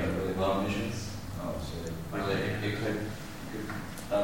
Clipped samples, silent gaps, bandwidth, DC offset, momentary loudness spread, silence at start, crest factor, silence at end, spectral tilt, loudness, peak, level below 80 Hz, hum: under 0.1%; none; 17 kHz; under 0.1%; 10 LU; 0 s; 16 dB; 0 s; -5.5 dB/octave; -34 LUFS; -16 dBFS; -48 dBFS; none